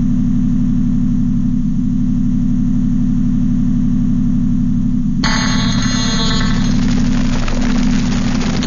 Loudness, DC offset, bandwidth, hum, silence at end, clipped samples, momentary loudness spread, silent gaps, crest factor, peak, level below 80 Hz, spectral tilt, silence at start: -16 LUFS; 0.5%; 7.4 kHz; 60 Hz at -30 dBFS; 0 s; under 0.1%; 2 LU; none; 10 dB; -2 dBFS; -18 dBFS; -5.5 dB/octave; 0 s